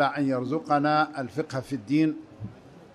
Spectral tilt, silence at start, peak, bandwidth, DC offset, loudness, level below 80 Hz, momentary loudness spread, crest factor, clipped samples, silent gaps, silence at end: -7 dB/octave; 0 s; -10 dBFS; 11.5 kHz; under 0.1%; -26 LUFS; -64 dBFS; 17 LU; 16 dB; under 0.1%; none; 0.1 s